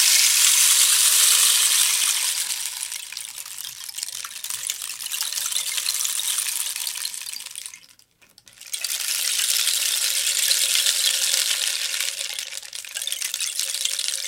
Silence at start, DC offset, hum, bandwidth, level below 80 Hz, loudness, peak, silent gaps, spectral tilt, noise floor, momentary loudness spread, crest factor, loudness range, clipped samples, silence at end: 0 s; under 0.1%; none; 17 kHz; -74 dBFS; -19 LUFS; 0 dBFS; none; 5.5 dB/octave; -55 dBFS; 17 LU; 22 dB; 9 LU; under 0.1%; 0 s